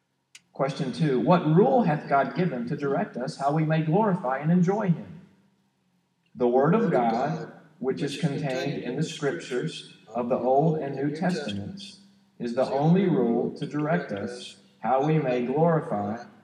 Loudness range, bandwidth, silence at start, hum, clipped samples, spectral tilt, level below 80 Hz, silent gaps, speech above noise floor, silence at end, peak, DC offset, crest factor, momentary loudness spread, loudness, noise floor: 4 LU; 10 kHz; 0.55 s; none; under 0.1%; -7.5 dB/octave; -78 dBFS; none; 45 dB; 0.15 s; -8 dBFS; under 0.1%; 18 dB; 12 LU; -26 LUFS; -70 dBFS